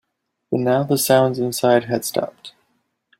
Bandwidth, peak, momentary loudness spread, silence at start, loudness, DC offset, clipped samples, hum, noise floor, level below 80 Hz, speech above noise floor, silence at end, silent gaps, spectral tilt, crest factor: 16 kHz; -2 dBFS; 10 LU; 0.5 s; -19 LUFS; under 0.1%; under 0.1%; none; -76 dBFS; -62 dBFS; 57 dB; 0.7 s; none; -5 dB/octave; 18 dB